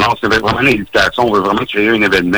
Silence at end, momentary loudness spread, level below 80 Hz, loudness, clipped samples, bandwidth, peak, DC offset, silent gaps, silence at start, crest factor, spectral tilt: 0 s; 2 LU; -38 dBFS; -12 LUFS; under 0.1%; over 20 kHz; -2 dBFS; under 0.1%; none; 0 s; 12 dB; -5 dB/octave